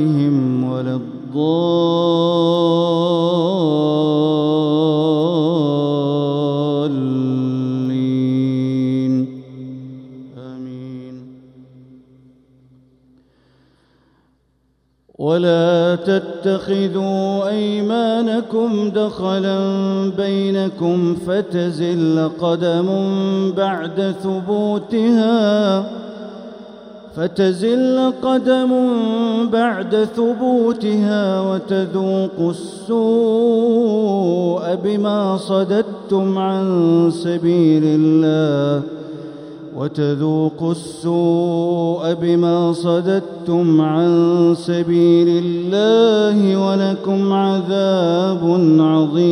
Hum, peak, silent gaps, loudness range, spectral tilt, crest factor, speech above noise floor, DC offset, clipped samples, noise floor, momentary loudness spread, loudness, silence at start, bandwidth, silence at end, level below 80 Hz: none; -2 dBFS; none; 5 LU; -7.5 dB/octave; 14 dB; 46 dB; under 0.1%; under 0.1%; -62 dBFS; 9 LU; -17 LUFS; 0 s; 10.5 kHz; 0 s; -60 dBFS